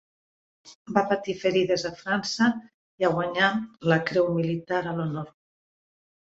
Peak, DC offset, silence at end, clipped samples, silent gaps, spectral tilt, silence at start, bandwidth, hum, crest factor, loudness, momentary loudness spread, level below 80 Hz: -6 dBFS; under 0.1%; 0.9 s; under 0.1%; 0.75-0.85 s, 2.74-2.98 s; -5.5 dB/octave; 0.65 s; 8 kHz; none; 20 dB; -25 LUFS; 7 LU; -64 dBFS